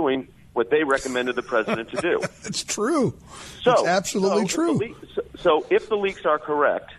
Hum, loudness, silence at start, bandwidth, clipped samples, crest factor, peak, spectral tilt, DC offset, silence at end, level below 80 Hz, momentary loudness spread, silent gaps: none; -23 LUFS; 0 s; 13 kHz; under 0.1%; 16 dB; -8 dBFS; -4 dB/octave; under 0.1%; 0 s; -56 dBFS; 9 LU; none